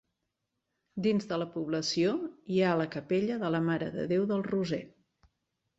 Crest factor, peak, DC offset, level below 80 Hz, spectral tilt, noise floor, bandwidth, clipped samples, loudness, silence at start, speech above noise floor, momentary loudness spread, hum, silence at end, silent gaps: 16 dB; -16 dBFS; under 0.1%; -70 dBFS; -6 dB/octave; -84 dBFS; 8 kHz; under 0.1%; -31 LUFS; 0.95 s; 54 dB; 6 LU; none; 0.9 s; none